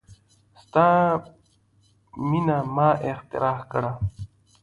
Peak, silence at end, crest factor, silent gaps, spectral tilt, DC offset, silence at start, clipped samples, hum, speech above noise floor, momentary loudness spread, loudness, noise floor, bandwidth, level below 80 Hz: -6 dBFS; 0.35 s; 18 dB; none; -9 dB/octave; under 0.1%; 0.1 s; under 0.1%; none; 39 dB; 13 LU; -23 LUFS; -62 dBFS; 11 kHz; -50 dBFS